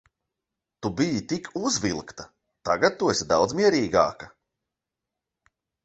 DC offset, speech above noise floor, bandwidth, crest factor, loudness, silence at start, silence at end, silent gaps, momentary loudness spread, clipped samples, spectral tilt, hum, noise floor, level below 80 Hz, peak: under 0.1%; 62 dB; 8.4 kHz; 22 dB; -24 LUFS; 0.8 s; 1.55 s; none; 18 LU; under 0.1%; -4 dB/octave; none; -86 dBFS; -56 dBFS; -6 dBFS